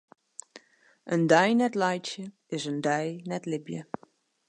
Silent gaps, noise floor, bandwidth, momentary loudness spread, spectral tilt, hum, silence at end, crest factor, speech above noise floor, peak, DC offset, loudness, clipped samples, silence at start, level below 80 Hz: none; -62 dBFS; 11 kHz; 23 LU; -5 dB/octave; none; 0.65 s; 22 dB; 35 dB; -6 dBFS; under 0.1%; -27 LUFS; under 0.1%; 0.55 s; -78 dBFS